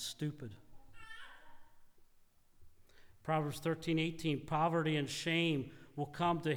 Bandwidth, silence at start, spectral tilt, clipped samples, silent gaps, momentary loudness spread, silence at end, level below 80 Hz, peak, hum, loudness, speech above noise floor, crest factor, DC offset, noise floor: 19.5 kHz; 0 s; -5.5 dB/octave; under 0.1%; none; 19 LU; 0 s; -64 dBFS; -22 dBFS; none; -36 LUFS; 30 dB; 16 dB; under 0.1%; -65 dBFS